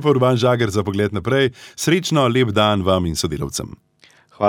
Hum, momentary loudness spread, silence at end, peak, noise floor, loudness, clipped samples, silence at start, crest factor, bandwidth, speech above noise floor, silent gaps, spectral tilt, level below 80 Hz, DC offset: none; 8 LU; 0 s; -2 dBFS; -52 dBFS; -18 LUFS; under 0.1%; 0 s; 16 dB; 17.5 kHz; 34 dB; none; -5.5 dB/octave; -44 dBFS; under 0.1%